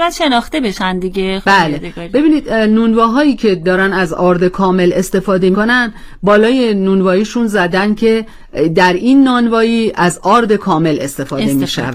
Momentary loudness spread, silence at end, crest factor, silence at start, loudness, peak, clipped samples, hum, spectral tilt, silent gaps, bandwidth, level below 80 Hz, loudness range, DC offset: 7 LU; 0 s; 12 dB; 0 s; -12 LUFS; 0 dBFS; under 0.1%; none; -5.5 dB/octave; none; 16 kHz; -36 dBFS; 1 LU; under 0.1%